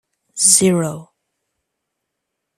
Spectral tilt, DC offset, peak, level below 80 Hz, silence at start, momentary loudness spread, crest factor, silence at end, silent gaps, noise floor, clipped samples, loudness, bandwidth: -3 dB/octave; under 0.1%; 0 dBFS; -60 dBFS; 0.35 s; 23 LU; 20 dB; 1.55 s; none; -78 dBFS; under 0.1%; -13 LUFS; 15.5 kHz